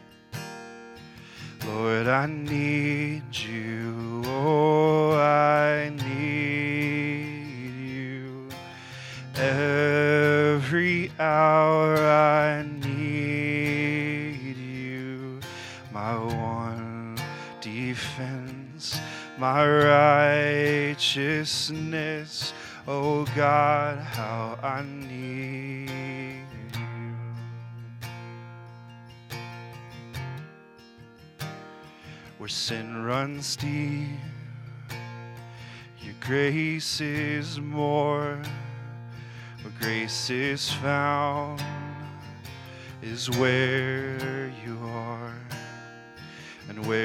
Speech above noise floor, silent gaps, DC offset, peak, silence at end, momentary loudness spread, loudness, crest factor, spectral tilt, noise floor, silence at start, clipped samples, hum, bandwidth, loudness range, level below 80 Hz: 24 dB; none; under 0.1%; -4 dBFS; 0 s; 21 LU; -26 LUFS; 24 dB; -5.5 dB/octave; -50 dBFS; 0 s; under 0.1%; none; 16 kHz; 14 LU; -64 dBFS